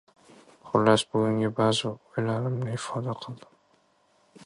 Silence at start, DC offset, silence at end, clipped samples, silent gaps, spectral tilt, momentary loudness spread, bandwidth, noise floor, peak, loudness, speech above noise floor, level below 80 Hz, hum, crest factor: 0.65 s; under 0.1%; 1.1 s; under 0.1%; none; -5.5 dB/octave; 13 LU; 11.5 kHz; -66 dBFS; -6 dBFS; -27 LUFS; 39 dB; -64 dBFS; none; 22 dB